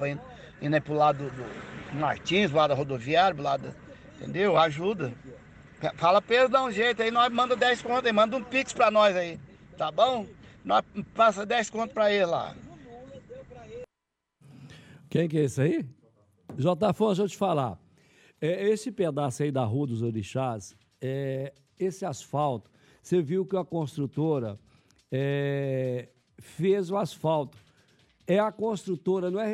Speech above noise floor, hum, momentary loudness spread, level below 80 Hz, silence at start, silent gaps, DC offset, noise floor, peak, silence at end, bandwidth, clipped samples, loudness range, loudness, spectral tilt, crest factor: 58 dB; none; 19 LU; -62 dBFS; 0 s; none; under 0.1%; -84 dBFS; -10 dBFS; 0 s; 13.5 kHz; under 0.1%; 7 LU; -27 LUFS; -5.5 dB/octave; 18 dB